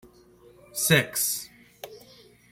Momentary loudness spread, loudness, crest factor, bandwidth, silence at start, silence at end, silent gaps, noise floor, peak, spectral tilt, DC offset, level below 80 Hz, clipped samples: 24 LU; -24 LUFS; 26 dB; 16.5 kHz; 0.75 s; 0.55 s; none; -55 dBFS; -4 dBFS; -3 dB/octave; under 0.1%; -62 dBFS; under 0.1%